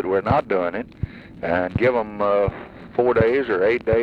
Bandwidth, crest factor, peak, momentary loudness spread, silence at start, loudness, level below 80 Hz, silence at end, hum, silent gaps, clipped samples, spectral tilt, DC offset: 5.6 kHz; 18 dB; -4 dBFS; 13 LU; 0 s; -21 LUFS; -42 dBFS; 0 s; none; none; under 0.1%; -9 dB/octave; under 0.1%